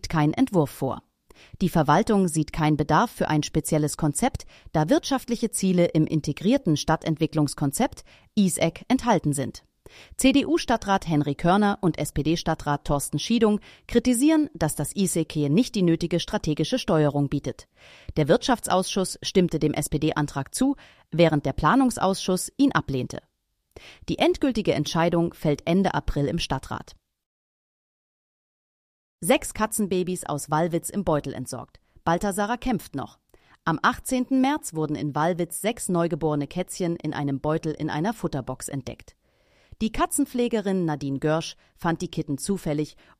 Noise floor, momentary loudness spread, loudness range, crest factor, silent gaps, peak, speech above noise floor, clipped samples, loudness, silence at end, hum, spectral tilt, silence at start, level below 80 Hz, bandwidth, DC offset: -62 dBFS; 9 LU; 5 LU; 20 dB; 27.26-29.18 s; -4 dBFS; 38 dB; under 0.1%; -24 LUFS; 0.3 s; none; -5.5 dB/octave; 0.05 s; -44 dBFS; 15.5 kHz; under 0.1%